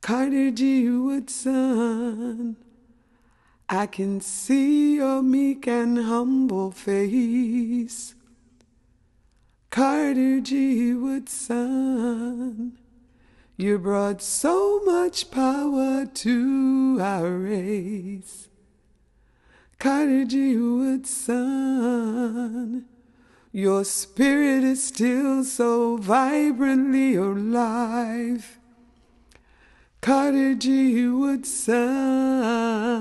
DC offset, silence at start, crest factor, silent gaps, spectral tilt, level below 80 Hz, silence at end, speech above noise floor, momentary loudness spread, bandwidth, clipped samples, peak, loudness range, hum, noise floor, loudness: under 0.1%; 0 s; 16 dB; none; -4.5 dB/octave; -60 dBFS; 0 s; 39 dB; 9 LU; 12.5 kHz; under 0.1%; -6 dBFS; 5 LU; none; -61 dBFS; -23 LUFS